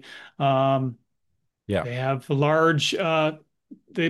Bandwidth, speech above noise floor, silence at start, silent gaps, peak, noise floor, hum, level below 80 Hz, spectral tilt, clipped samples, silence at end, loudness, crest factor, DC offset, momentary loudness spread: 12.5 kHz; 54 dB; 0.05 s; none; -8 dBFS; -77 dBFS; none; -64 dBFS; -5.5 dB/octave; under 0.1%; 0 s; -23 LUFS; 16 dB; under 0.1%; 10 LU